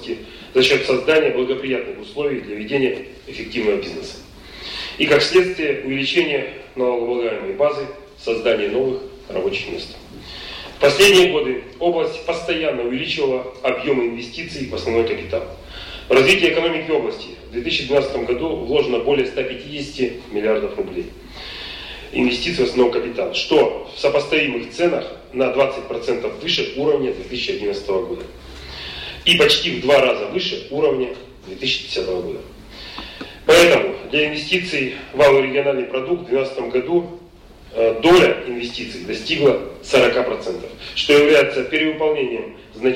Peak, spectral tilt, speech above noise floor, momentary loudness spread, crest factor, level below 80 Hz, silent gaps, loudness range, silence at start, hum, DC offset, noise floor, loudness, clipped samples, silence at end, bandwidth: -2 dBFS; -4 dB/octave; 24 dB; 17 LU; 18 dB; -46 dBFS; none; 5 LU; 0 s; none; under 0.1%; -43 dBFS; -18 LUFS; under 0.1%; 0 s; 16 kHz